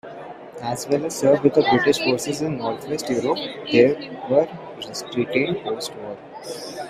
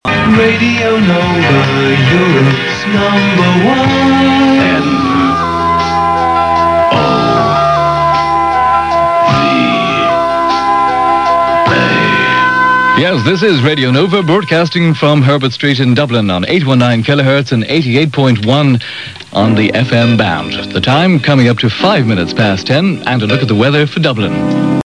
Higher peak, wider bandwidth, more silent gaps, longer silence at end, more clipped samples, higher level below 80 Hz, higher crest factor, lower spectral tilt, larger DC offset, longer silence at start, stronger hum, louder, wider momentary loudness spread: about the same, -2 dBFS vs 0 dBFS; first, 15.5 kHz vs 10.5 kHz; neither; about the same, 0 s vs 0.05 s; neither; second, -60 dBFS vs -38 dBFS; first, 20 dB vs 10 dB; second, -4.5 dB/octave vs -6.5 dB/octave; second, under 0.1% vs 0.3%; about the same, 0.05 s vs 0.05 s; neither; second, -21 LUFS vs -10 LUFS; first, 17 LU vs 4 LU